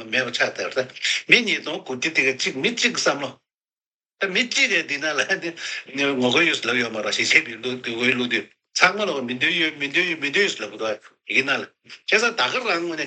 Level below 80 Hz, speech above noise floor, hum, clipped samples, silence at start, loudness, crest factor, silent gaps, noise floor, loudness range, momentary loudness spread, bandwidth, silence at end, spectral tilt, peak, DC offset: -74 dBFS; over 67 dB; none; under 0.1%; 0 s; -21 LUFS; 22 dB; 3.54-3.58 s, 3.86-4.00 s; under -90 dBFS; 2 LU; 11 LU; 9.4 kHz; 0 s; -2 dB/octave; 0 dBFS; under 0.1%